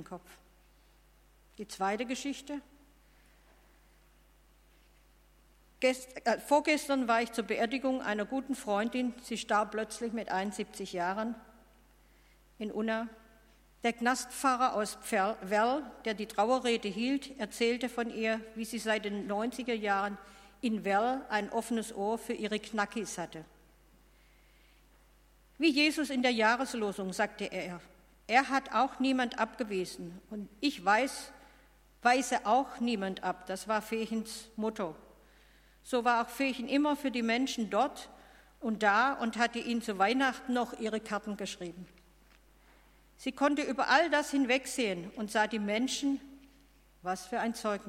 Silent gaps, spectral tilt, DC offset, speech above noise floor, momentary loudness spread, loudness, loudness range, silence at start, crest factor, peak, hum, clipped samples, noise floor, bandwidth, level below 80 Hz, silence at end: none; -3.5 dB/octave; under 0.1%; 31 dB; 12 LU; -32 LUFS; 7 LU; 0 s; 24 dB; -10 dBFS; none; under 0.1%; -63 dBFS; 16.5 kHz; -64 dBFS; 0 s